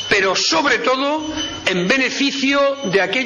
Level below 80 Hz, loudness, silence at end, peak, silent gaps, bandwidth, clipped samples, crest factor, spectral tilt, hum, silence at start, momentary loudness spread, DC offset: -50 dBFS; -17 LUFS; 0 s; -4 dBFS; none; 10.5 kHz; under 0.1%; 12 dB; -3 dB/octave; none; 0 s; 6 LU; under 0.1%